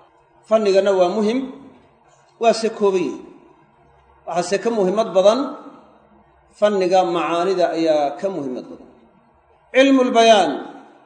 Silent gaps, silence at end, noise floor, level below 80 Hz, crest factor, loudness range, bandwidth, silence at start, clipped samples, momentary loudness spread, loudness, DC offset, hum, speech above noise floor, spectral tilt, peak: none; 0.25 s; -55 dBFS; -66 dBFS; 20 dB; 4 LU; 9.4 kHz; 0.5 s; under 0.1%; 16 LU; -18 LUFS; under 0.1%; none; 38 dB; -4.5 dB/octave; 0 dBFS